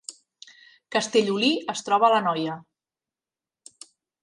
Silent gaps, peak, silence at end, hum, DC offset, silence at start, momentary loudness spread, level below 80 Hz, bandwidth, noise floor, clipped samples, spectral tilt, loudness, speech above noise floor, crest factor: none; -8 dBFS; 1.6 s; none; under 0.1%; 0.1 s; 13 LU; -78 dBFS; 11.5 kHz; under -90 dBFS; under 0.1%; -3.5 dB/octave; -23 LUFS; over 67 dB; 20 dB